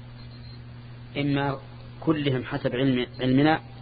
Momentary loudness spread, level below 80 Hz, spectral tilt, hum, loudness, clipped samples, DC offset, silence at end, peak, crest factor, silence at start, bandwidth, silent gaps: 21 LU; -50 dBFS; -11 dB/octave; none; -25 LUFS; under 0.1%; under 0.1%; 0 s; -6 dBFS; 20 dB; 0 s; 5 kHz; none